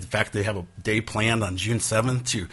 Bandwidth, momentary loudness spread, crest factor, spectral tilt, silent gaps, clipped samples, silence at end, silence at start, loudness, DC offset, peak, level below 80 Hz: 11.5 kHz; 5 LU; 18 dB; -4 dB/octave; none; under 0.1%; 0 s; 0 s; -25 LUFS; under 0.1%; -6 dBFS; -50 dBFS